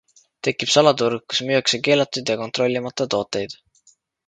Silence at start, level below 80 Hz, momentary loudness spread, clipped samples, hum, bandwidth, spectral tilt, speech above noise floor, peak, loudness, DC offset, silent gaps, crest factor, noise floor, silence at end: 0.45 s; -62 dBFS; 11 LU; under 0.1%; none; 9.4 kHz; -3.5 dB/octave; 39 dB; 0 dBFS; -20 LUFS; under 0.1%; none; 22 dB; -59 dBFS; 0.75 s